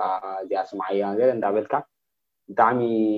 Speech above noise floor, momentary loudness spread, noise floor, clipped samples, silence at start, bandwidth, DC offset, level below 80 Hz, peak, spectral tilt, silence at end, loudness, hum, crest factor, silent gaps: 60 dB; 8 LU; -82 dBFS; under 0.1%; 0 s; 6.4 kHz; under 0.1%; -72 dBFS; -4 dBFS; -8.5 dB/octave; 0 s; -24 LUFS; none; 20 dB; none